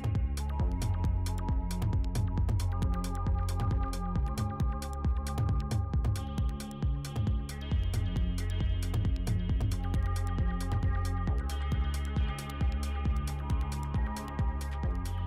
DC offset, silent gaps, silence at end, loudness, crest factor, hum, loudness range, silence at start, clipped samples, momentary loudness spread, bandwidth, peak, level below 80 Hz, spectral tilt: under 0.1%; none; 0 s; -33 LUFS; 8 dB; none; 1 LU; 0 s; under 0.1%; 3 LU; 15 kHz; -22 dBFS; -34 dBFS; -6.5 dB/octave